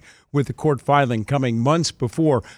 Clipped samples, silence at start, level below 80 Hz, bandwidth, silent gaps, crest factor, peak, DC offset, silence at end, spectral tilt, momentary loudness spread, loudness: under 0.1%; 0.35 s; -52 dBFS; 12.5 kHz; none; 16 dB; -4 dBFS; under 0.1%; 0.05 s; -6 dB/octave; 6 LU; -21 LUFS